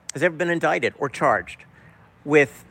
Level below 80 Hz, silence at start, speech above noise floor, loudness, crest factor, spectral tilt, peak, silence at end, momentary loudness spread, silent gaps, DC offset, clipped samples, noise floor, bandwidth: -60 dBFS; 0.15 s; 29 dB; -21 LUFS; 18 dB; -5 dB/octave; -4 dBFS; 0.1 s; 20 LU; none; under 0.1%; under 0.1%; -51 dBFS; 16.5 kHz